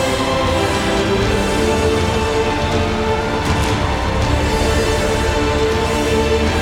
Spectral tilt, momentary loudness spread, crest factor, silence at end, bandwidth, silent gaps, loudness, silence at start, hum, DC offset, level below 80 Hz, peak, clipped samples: -5 dB/octave; 2 LU; 12 dB; 0 s; 17.5 kHz; none; -17 LUFS; 0 s; none; under 0.1%; -24 dBFS; -4 dBFS; under 0.1%